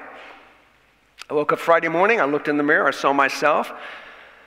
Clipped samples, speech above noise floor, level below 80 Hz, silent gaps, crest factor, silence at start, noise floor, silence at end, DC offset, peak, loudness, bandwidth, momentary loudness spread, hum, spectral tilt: under 0.1%; 39 dB; -68 dBFS; none; 18 dB; 0 s; -58 dBFS; 0.3 s; under 0.1%; -2 dBFS; -19 LUFS; 16 kHz; 18 LU; none; -4.5 dB/octave